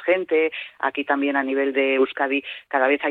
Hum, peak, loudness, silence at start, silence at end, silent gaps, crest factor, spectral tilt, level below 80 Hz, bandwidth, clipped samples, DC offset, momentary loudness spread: none; -6 dBFS; -22 LUFS; 0 s; 0 s; none; 16 dB; -6 dB/octave; -70 dBFS; 4.2 kHz; under 0.1%; under 0.1%; 6 LU